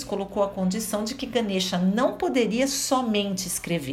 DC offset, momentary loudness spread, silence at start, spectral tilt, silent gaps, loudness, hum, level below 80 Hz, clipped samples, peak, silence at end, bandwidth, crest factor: under 0.1%; 5 LU; 0 s; -4 dB/octave; none; -25 LUFS; none; -54 dBFS; under 0.1%; -10 dBFS; 0 s; 16 kHz; 16 dB